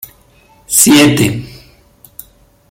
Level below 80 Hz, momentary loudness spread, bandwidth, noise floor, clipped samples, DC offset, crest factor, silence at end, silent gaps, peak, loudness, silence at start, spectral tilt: -44 dBFS; 19 LU; over 20 kHz; -47 dBFS; 0.1%; under 0.1%; 14 dB; 1.15 s; none; 0 dBFS; -9 LUFS; 0.7 s; -3.5 dB/octave